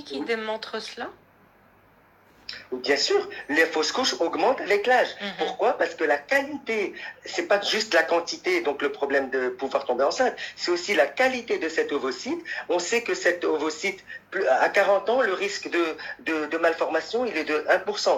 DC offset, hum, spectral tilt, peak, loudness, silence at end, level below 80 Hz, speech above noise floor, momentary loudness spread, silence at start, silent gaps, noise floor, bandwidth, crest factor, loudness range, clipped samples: under 0.1%; none; -2 dB/octave; -6 dBFS; -24 LUFS; 0 s; -70 dBFS; 33 dB; 10 LU; 0 s; none; -57 dBFS; 16 kHz; 20 dB; 3 LU; under 0.1%